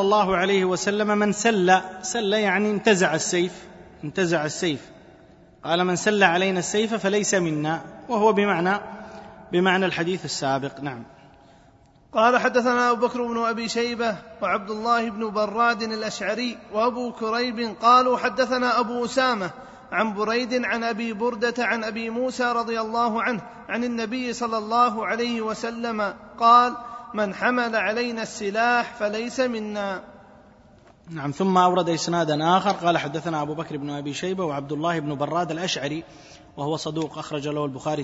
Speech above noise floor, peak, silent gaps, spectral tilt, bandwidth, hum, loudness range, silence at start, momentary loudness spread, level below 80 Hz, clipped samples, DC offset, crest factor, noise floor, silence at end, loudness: 31 dB; -2 dBFS; none; -4.5 dB/octave; 8 kHz; none; 4 LU; 0 s; 11 LU; -60 dBFS; under 0.1%; under 0.1%; 22 dB; -54 dBFS; 0 s; -23 LUFS